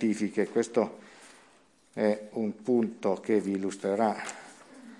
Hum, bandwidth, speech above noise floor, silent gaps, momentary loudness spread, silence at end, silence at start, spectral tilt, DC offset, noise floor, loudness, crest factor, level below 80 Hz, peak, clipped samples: none; 11.5 kHz; 33 dB; none; 16 LU; 0.05 s; 0 s; -6 dB/octave; under 0.1%; -62 dBFS; -30 LUFS; 18 dB; -80 dBFS; -12 dBFS; under 0.1%